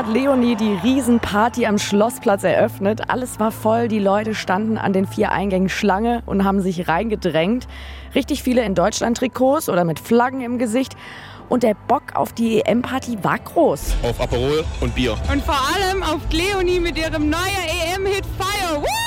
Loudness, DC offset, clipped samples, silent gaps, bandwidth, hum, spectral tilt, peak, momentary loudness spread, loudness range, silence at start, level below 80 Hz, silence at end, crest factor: -19 LUFS; under 0.1%; under 0.1%; none; 17 kHz; none; -5 dB/octave; -4 dBFS; 5 LU; 2 LU; 0 s; -34 dBFS; 0 s; 14 dB